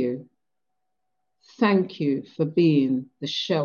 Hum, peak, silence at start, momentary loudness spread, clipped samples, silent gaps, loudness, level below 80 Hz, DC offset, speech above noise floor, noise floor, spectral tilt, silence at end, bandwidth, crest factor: none; -6 dBFS; 0 s; 9 LU; under 0.1%; none; -24 LUFS; -72 dBFS; under 0.1%; 61 dB; -84 dBFS; -7 dB/octave; 0 s; 7 kHz; 18 dB